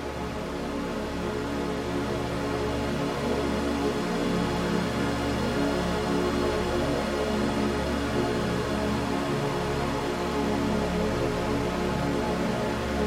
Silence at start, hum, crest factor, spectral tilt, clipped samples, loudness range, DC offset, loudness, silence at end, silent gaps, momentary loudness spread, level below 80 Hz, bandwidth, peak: 0 s; 60 Hz at -45 dBFS; 14 dB; -5.5 dB/octave; under 0.1%; 2 LU; under 0.1%; -28 LUFS; 0 s; none; 4 LU; -40 dBFS; 16 kHz; -12 dBFS